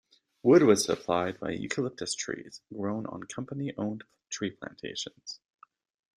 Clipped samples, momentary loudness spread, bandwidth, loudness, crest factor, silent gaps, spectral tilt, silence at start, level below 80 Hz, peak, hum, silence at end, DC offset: under 0.1%; 19 LU; 14 kHz; -29 LUFS; 22 dB; none; -4.5 dB/octave; 0.45 s; -68 dBFS; -10 dBFS; none; 0.8 s; under 0.1%